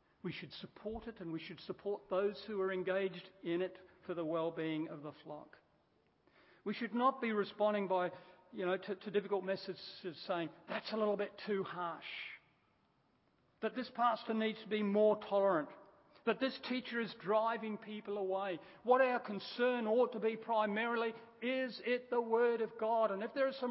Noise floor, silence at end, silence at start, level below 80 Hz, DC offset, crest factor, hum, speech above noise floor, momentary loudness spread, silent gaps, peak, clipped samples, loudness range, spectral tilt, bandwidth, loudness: -75 dBFS; 0 s; 0.25 s; -76 dBFS; under 0.1%; 22 dB; none; 38 dB; 13 LU; none; -16 dBFS; under 0.1%; 6 LU; -3.5 dB/octave; 5.6 kHz; -38 LUFS